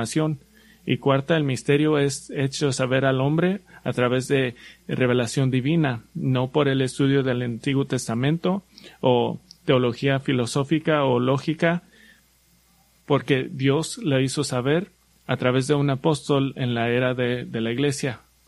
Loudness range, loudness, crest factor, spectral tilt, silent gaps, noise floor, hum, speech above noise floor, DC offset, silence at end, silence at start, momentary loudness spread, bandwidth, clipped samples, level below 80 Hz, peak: 2 LU; -23 LUFS; 18 dB; -6 dB/octave; none; -60 dBFS; none; 38 dB; under 0.1%; 0.3 s; 0 s; 7 LU; 12 kHz; under 0.1%; -58 dBFS; -4 dBFS